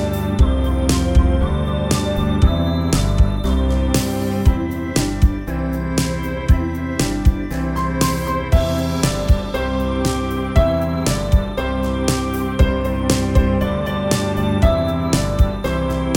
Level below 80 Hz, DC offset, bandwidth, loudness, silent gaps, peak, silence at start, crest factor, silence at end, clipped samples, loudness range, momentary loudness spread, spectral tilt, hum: -20 dBFS; under 0.1%; 17.5 kHz; -19 LUFS; none; -2 dBFS; 0 s; 16 dB; 0 s; under 0.1%; 2 LU; 5 LU; -6 dB/octave; none